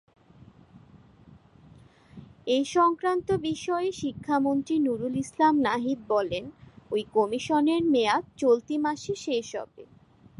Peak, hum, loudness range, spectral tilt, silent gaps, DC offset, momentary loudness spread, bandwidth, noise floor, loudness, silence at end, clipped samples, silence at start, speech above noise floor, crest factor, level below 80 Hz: -10 dBFS; none; 3 LU; -5 dB/octave; none; under 0.1%; 9 LU; 11.5 kHz; -54 dBFS; -26 LUFS; 0.55 s; under 0.1%; 1.3 s; 28 dB; 18 dB; -62 dBFS